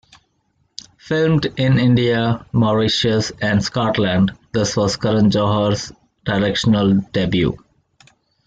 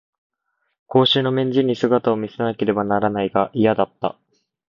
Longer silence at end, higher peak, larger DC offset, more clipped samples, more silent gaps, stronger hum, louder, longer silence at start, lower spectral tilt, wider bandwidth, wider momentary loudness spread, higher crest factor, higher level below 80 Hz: first, 0.9 s vs 0.6 s; about the same, -4 dBFS vs -2 dBFS; neither; neither; neither; neither; about the same, -17 LUFS vs -19 LUFS; first, 1.05 s vs 0.9 s; second, -6 dB/octave vs -7.5 dB/octave; first, 9 kHz vs 7.2 kHz; about the same, 9 LU vs 7 LU; about the same, 14 dB vs 18 dB; first, -46 dBFS vs -58 dBFS